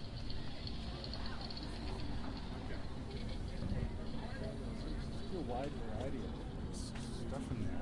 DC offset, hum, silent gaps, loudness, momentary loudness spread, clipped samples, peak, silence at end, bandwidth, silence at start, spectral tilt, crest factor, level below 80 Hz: under 0.1%; none; none; -44 LUFS; 4 LU; under 0.1%; -26 dBFS; 0 s; 11.5 kHz; 0 s; -6 dB/octave; 14 dB; -46 dBFS